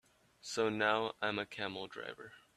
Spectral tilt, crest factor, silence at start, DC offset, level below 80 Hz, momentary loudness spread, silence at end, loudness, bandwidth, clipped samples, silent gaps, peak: -3.5 dB/octave; 24 dB; 0.45 s; under 0.1%; -76 dBFS; 15 LU; 0.15 s; -37 LUFS; 13.5 kHz; under 0.1%; none; -16 dBFS